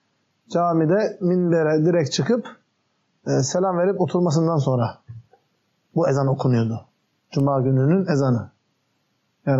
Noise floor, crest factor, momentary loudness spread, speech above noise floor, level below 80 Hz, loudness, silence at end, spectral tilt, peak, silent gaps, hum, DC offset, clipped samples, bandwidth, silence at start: -69 dBFS; 12 dB; 10 LU; 50 dB; -66 dBFS; -21 LUFS; 0 s; -7 dB/octave; -8 dBFS; none; none; under 0.1%; under 0.1%; 8 kHz; 0.5 s